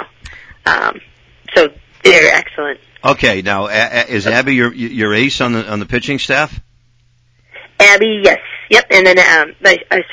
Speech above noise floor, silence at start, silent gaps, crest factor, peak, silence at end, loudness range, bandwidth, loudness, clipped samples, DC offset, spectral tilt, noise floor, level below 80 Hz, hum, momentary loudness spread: 41 dB; 0 s; none; 12 dB; 0 dBFS; 0 s; 6 LU; 8 kHz; -11 LUFS; 0.6%; under 0.1%; -3.5 dB/octave; -53 dBFS; -42 dBFS; none; 12 LU